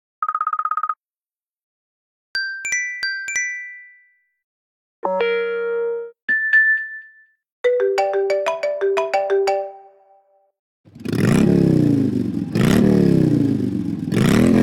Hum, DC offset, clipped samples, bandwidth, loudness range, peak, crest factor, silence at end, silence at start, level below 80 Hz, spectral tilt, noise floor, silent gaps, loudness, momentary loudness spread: none; under 0.1%; under 0.1%; 17 kHz; 8 LU; -6 dBFS; 14 dB; 0 s; 0.2 s; -46 dBFS; -6 dB/octave; under -90 dBFS; 1.46-1.50 s, 1.63-2.34 s, 4.44-5.03 s, 6.22-6.28 s, 7.52-7.64 s, 10.59-10.84 s; -19 LUFS; 12 LU